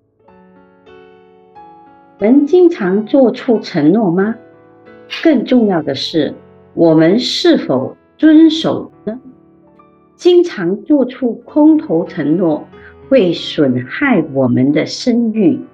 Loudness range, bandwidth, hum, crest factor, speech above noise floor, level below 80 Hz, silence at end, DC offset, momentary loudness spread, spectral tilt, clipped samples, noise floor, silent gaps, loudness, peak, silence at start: 2 LU; 8 kHz; none; 14 dB; 35 dB; -58 dBFS; 0.05 s; under 0.1%; 10 LU; -6.5 dB/octave; under 0.1%; -47 dBFS; none; -13 LUFS; 0 dBFS; 1.55 s